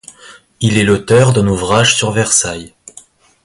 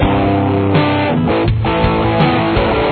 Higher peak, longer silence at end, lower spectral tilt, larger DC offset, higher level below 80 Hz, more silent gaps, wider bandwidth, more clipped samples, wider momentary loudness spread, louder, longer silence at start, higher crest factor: about the same, 0 dBFS vs 0 dBFS; first, 0.75 s vs 0 s; second, -4 dB/octave vs -10.5 dB/octave; neither; second, -38 dBFS vs -26 dBFS; neither; first, 11.5 kHz vs 4.5 kHz; neither; first, 7 LU vs 2 LU; about the same, -12 LUFS vs -14 LUFS; first, 0.25 s vs 0 s; about the same, 14 dB vs 12 dB